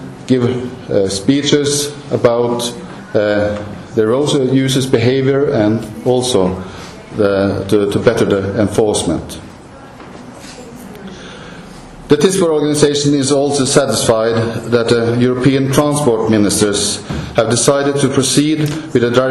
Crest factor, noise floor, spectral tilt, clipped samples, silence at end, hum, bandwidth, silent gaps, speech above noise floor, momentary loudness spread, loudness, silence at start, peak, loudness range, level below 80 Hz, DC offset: 14 dB; -35 dBFS; -5 dB/octave; under 0.1%; 0 s; none; 14 kHz; none; 22 dB; 19 LU; -14 LUFS; 0 s; 0 dBFS; 5 LU; -42 dBFS; under 0.1%